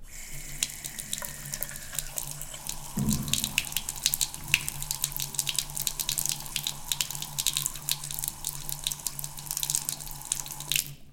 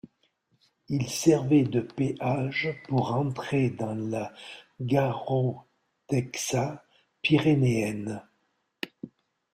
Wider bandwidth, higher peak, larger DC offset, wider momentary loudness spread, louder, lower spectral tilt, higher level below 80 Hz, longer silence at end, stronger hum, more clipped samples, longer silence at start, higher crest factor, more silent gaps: about the same, 17 kHz vs 16 kHz; first, -4 dBFS vs -10 dBFS; neither; second, 8 LU vs 17 LU; second, -30 LUFS vs -27 LUFS; second, -1 dB/octave vs -6 dB/octave; first, -46 dBFS vs -62 dBFS; second, 0 s vs 0.45 s; neither; neither; second, 0 s vs 0.9 s; first, 30 dB vs 18 dB; neither